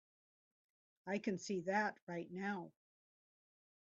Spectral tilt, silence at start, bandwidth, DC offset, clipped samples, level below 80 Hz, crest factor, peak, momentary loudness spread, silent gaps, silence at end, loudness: -4.5 dB/octave; 1.05 s; 7.4 kHz; under 0.1%; under 0.1%; -86 dBFS; 20 dB; -24 dBFS; 11 LU; 2.02-2.07 s; 1.15 s; -42 LUFS